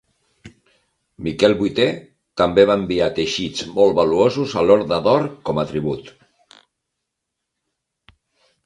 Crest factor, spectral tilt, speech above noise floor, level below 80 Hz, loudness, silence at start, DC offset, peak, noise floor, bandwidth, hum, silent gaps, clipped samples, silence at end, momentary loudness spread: 20 dB; -5.5 dB/octave; 62 dB; -50 dBFS; -18 LUFS; 0.45 s; under 0.1%; 0 dBFS; -79 dBFS; 10.5 kHz; none; none; under 0.1%; 2.55 s; 11 LU